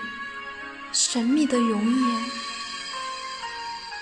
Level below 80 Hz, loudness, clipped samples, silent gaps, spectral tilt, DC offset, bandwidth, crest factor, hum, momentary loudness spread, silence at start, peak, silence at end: -62 dBFS; -26 LUFS; under 0.1%; none; -2.5 dB/octave; under 0.1%; 11.5 kHz; 16 dB; none; 12 LU; 0 s; -10 dBFS; 0 s